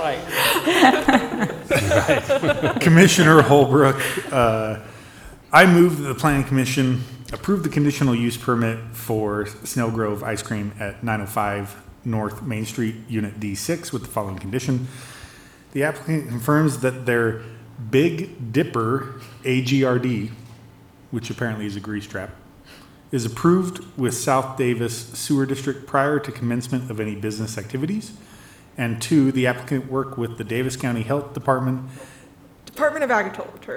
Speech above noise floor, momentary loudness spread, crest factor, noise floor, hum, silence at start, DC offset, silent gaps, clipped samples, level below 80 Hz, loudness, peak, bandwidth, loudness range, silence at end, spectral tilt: 27 dB; 15 LU; 20 dB; -47 dBFS; none; 0 s; under 0.1%; none; under 0.1%; -50 dBFS; -21 LUFS; 0 dBFS; over 20 kHz; 11 LU; 0 s; -5.5 dB/octave